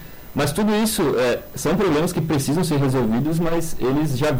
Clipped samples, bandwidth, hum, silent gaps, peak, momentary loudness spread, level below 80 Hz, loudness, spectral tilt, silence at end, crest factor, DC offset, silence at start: under 0.1%; 16.5 kHz; none; none; -12 dBFS; 4 LU; -38 dBFS; -21 LUFS; -5.5 dB/octave; 0 s; 8 dB; under 0.1%; 0 s